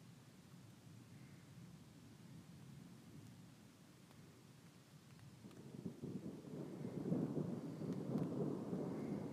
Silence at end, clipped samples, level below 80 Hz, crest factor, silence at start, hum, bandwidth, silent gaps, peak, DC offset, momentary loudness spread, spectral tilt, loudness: 0 s; under 0.1%; -80 dBFS; 22 dB; 0 s; none; 15.5 kHz; none; -28 dBFS; under 0.1%; 19 LU; -8 dB/octave; -48 LUFS